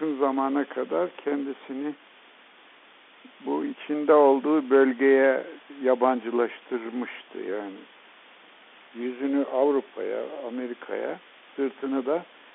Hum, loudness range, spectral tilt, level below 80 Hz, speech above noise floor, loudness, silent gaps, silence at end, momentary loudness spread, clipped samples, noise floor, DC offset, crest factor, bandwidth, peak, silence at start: none; 10 LU; -3 dB/octave; -80 dBFS; 28 dB; -26 LUFS; none; 0.3 s; 16 LU; under 0.1%; -53 dBFS; under 0.1%; 20 dB; 4 kHz; -6 dBFS; 0 s